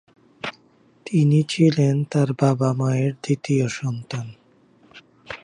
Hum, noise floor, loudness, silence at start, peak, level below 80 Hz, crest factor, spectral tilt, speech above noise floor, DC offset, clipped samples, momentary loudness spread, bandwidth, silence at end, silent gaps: none; -56 dBFS; -21 LUFS; 0.45 s; -4 dBFS; -64 dBFS; 18 dB; -7 dB/octave; 37 dB; under 0.1%; under 0.1%; 16 LU; 10.5 kHz; 0.05 s; none